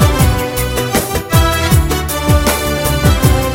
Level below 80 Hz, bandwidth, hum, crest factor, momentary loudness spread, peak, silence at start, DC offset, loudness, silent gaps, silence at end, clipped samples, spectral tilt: -18 dBFS; 17 kHz; none; 12 dB; 5 LU; 0 dBFS; 0 s; 0.4%; -13 LUFS; none; 0 s; under 0.1%; -5 dB/octave